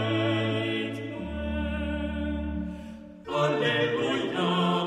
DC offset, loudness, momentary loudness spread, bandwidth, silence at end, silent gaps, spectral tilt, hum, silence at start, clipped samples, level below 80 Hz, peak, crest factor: under 0.1%; -28 LUFS; 10 LU; 12 kHz; 0 s; none; -6.5 dB/octave; none; 0 s; under 0.1%; -40 dBFS; -12 dBFS; 16 dB